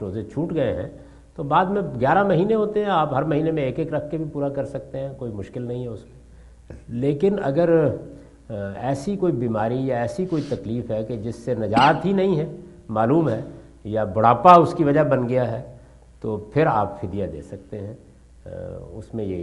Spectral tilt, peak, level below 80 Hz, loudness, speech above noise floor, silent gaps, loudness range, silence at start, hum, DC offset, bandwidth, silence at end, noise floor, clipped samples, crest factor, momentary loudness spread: -8 dB/octave; 0 dBFS; -48 dBFS; -22 LUFS; 25 dB; none; 9 LU; 0 s; none; under 0.1%; 11.5 kHz; 0 s; -46 dBFS; under 0.1%; 22 dB; 17 LU